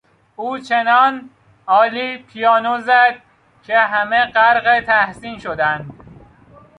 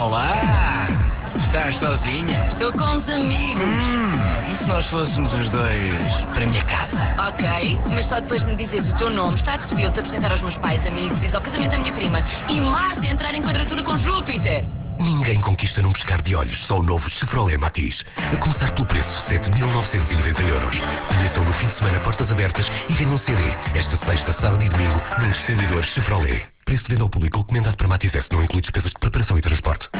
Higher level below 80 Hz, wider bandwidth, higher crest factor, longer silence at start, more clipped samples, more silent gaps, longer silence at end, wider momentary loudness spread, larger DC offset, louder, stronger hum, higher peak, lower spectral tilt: second, -56 dBFS vs -26 dBFS; first, 10 kHz vs 4 kHz; about the same, 16 dB vs 12 dB; first, 0.4 s vs 0 s; neither; neither; first, 0.85 s vs 0 s; first, 15 LU vs 3 LU; neither; first, -15 LUFS vs -22 LUFS; neither; first, -2 dBFS vs -8 dBFS; second, -5 dB/octave vs -10.5 dB/octave